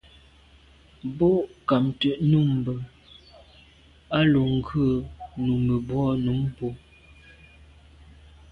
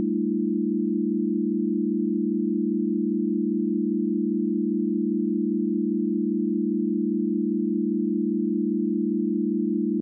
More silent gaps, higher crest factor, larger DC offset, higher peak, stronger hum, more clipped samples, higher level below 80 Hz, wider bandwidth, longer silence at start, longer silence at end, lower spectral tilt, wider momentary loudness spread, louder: neither; first, 18 dB vs 8 dB; neither; first, -8 dBFS vs -16 dBFS; neither; neither; first, -48 dBFS vs -88 dBFS; first, 5.2 kHz vs 0.5 kHz; first, 1.05 s vs 0 s; first, 1.75 s vs 0 s; second, -9 dB/octave vs -20.5 dB/octave; first, 14 LU vs 0 LU; about the same, -24 LUFS vs -25 LUFS